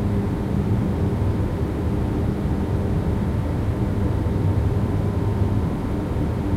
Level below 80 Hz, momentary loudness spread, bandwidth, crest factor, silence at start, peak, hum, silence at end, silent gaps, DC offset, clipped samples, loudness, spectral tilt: -28 dBFS; 2 LU; 13 kHz; 12 dB; 0 s; -8 dBFS; none; 0 s; none; under 0.1%; under 0.1%; -23 LUFS; -9 dB/octave